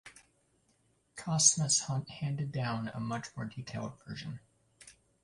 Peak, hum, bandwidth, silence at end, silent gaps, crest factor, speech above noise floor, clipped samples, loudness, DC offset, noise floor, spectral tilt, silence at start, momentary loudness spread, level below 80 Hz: -10 dBFS; none; 11.5 kHz; 0.35 s; none; 26 dB; 39 dB; under 0.1%; -32 LUFS; under 0.1%; -72 dBFS; -3 dB/octave; 0.05 s; 19 LU; -66 dBFS